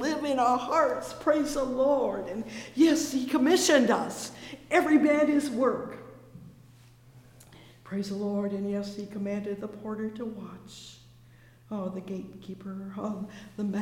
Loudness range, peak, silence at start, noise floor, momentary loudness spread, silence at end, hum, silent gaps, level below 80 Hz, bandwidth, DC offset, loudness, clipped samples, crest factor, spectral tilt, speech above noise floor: 14 LU; -8 dBFS; 0 s; -55 dBFS; 19 LU; 0 s; none; none; -60 dBFS; 17 kHz; under 0.1%; -28 LUFS; under 0.1%; 22 dB; -4.5 dB/octave; 27 dB